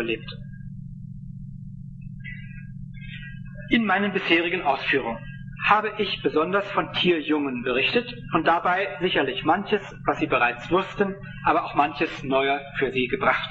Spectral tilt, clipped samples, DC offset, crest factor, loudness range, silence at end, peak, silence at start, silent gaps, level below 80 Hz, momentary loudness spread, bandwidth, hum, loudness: -6.5 dB/octave; under 0.1%; under 0.1%; 20 dB; 6 LU; 0 s; -4 dBFS; 0 s; none; -48 dBFS; 18 LU; 7.8 kHz; none; -23 LUFS